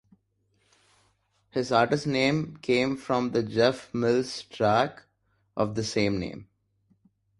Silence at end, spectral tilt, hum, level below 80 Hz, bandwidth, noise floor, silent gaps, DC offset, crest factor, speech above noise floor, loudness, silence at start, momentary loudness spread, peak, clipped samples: 0.95 s; -5.5 dB/octave; none; -58 dBFS; 11.5 kHz; -71 dBFS; none; under 0.1%; 22 dB; 45 dB; -26 LUFS; 1.55 s; 9 LU; -6 dBFS; under 0.1%